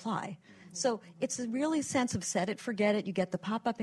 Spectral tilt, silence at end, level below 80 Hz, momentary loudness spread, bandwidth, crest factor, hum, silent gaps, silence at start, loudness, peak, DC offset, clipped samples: -4.5 dB/octave; 0 s; -66 dBFS; 7 LU; 12.5 kHz; 18 dB; none; none; 0 s; -33 LUFS; -16 dBFS; under 0.1%; under 0.1%